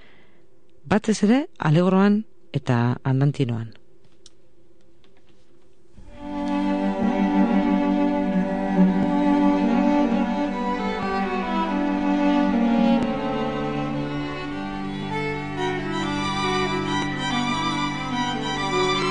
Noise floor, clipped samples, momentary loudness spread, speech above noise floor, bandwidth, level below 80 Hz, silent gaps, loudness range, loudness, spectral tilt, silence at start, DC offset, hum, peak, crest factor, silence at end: -58 dBFS; under 0.1%; 8 LU; 38 dB; 10 kHz; -46 dBFS; none; 6 LU; -22 LUFS; -6.5 dB/octave; 0.85 s; 0.9%; none; -6 dBFS; 16 dB; 0 s